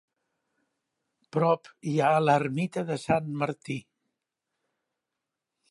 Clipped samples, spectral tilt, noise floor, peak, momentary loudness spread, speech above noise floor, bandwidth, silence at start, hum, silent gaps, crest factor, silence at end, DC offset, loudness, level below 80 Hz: under 0.1%; -7 dB/octave; -86 dBFS; -10 dBFS; 11 LU; 60 dB; 11.5 kHz; 1.35 s; none; none; 20 dB; 1.9 s; under 0.1%; -27 LUFS; -68 dBFS